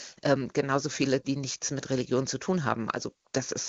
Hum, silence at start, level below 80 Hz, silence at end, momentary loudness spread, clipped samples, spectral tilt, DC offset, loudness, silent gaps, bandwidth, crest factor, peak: none; 0 s; -64 dBFS; 0 s; 6 LU; under 0.1%; -4.5 dB/octave; under 0.1%; -29 LUFS; none; 8 kHz; 20 dB; -10 dBFS